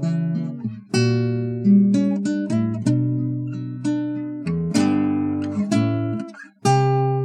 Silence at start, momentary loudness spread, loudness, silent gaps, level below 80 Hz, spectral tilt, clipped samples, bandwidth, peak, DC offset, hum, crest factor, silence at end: 0 s; 10 LU; -21 LUFS; none; -58 dBFS; -7 dB/octave; under 0.1%; 11 kHz; -6 dBFS; under 0.1%; none; 14 dB; 0 s